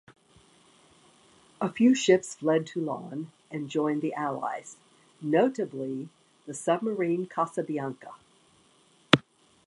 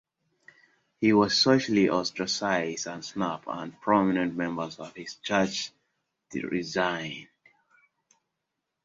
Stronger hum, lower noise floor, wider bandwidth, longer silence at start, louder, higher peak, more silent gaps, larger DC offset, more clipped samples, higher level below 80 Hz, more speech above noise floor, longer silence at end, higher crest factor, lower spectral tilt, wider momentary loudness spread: neither; second, -62 dBFS vs -84 dBFS; first, 11.5 kHz vs 7.8 kHz; first, 1.6 s vs 1 s; about the same, -28 LUFS vs -27 LUFS; first, 0 dBFS vs -8 dBFS; neither; neither; neither; about the same, -70 dBFS vs -66 dBFS; second, 35 dB vs 57 dB; second, 0.45 s vs 1.6 s; first, 30 dB vs 22 dB; about the same, -5 dB/octave vs -4.5 dB/octave; about the same, 16 LU vs 16 LU